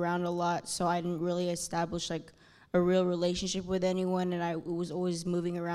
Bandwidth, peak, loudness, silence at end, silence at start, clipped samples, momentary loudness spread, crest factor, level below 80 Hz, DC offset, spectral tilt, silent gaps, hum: 14 kHz; -16 dBFS; -32 LUFS; 0 s; 0 s; under 0.1%; 6 LU; 14 dB; -60 dBFS; under 0.1%; -5.5 dB/octave; none; none